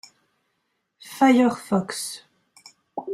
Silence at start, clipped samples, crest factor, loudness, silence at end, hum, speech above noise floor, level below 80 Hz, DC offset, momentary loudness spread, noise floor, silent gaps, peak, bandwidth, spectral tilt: 1.05 s; under 0.1%; 18 dB; -21 LUFS; 0 s; none; 54 dB; -70 dBFS; under 0.1%; 22 LU; -75 dBFS; none; -6 dBFS; 14.5 kHz; -5 dB/octave